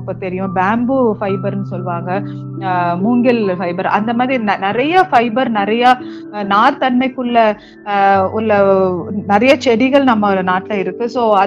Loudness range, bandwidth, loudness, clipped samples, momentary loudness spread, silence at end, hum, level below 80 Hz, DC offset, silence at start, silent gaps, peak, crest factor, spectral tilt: 4 LU; 8.2 kHz; -14 LUFS; under 0.1%; 10 LU; 0 s; none; -54 dBFS; under 0.1%; 0 s; none; 0 dBFS; 14 dB; -7 dB/octave